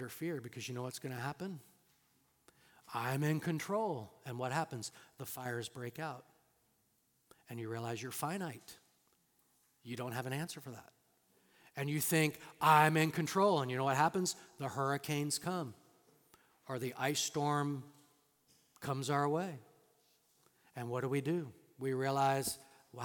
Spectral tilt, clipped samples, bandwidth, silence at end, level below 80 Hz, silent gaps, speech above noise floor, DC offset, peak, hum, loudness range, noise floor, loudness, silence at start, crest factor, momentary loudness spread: -4.5 dB/octave; under 0.1%; 18 kHz; 0 s; -80 dBFS; none; 40 dB; under 0.1%; -14 dBFS; none; 13 LU; -76 dBFS; -37 LUFS; 0 s; 24 dB; 16 LU